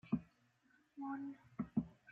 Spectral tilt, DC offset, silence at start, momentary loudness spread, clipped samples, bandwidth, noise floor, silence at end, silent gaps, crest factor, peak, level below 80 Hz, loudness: -9 dB/octave; under 0.1%; 0.05 s; 8 LU; under 0.1%; 4.9 kHz; -75 dBFS; 0 s; none; 20 dB; -26 dBFS; -70 dBFS; -45 LUFS